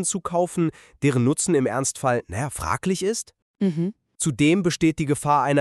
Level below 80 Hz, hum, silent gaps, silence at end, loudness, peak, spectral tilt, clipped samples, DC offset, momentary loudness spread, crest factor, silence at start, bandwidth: -50 dBFS; none; 3.42-3.54 s; 0 s; -23 LUFS; -6 dBFS; -5 dB/octave; under 0.1%; under 0.1%; 8 LU; 16 dB; 0 s; 13.5 kHz